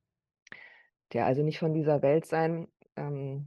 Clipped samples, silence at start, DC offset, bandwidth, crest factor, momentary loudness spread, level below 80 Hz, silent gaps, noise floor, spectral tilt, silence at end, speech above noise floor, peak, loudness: under 0.1%; 0.55 s; under 0.1%; 12 kHz; 16 dB; 20 LU; -72 dBFS; none; -52 dBFS; -8.5 dB/octave; 0 s; 24 dB; -14 dBFS; -29 LUFS